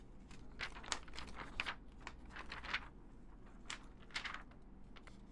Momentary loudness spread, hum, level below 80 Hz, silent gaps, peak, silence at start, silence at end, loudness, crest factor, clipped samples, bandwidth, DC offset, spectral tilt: 17 LU; none; -58 dBFS; none; -18 dBFS; 0 s; 0 s; -47 LUFS; 30 dB; under 0.1%; 11.5 kHz; under 0.1%; -2 dB/octave